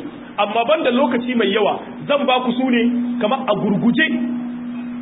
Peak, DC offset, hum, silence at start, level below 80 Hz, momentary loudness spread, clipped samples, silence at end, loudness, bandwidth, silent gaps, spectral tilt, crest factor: -4 dBFS; under 0.1%; none; 0 s; -60 dBFS; 10 LU; under 0.1%; 0 s; -18 LUFS; 4 kHz; none; -10.5 dB/octave; 16 dB